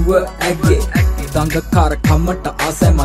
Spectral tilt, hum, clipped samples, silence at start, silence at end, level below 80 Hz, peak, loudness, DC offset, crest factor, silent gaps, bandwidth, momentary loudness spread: -6 dB/octave; none; under 0.1%; 0 s; 0 s; -20 dBFS; 0 dBFS; -15 LUFS; under 0.1%; 14 dB; none; 15.5 kHz; 5 LU